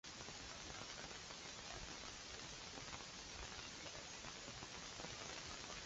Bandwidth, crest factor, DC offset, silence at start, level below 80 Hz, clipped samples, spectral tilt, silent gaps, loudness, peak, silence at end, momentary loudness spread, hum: 8 kHz; 20 dB; under 0.1%; 0.05 s; -66 dBFS; under 0.1%; -1.5 dB/octave; none; -51 LUFS; -34 dBFS; 0 s; 2 LU; none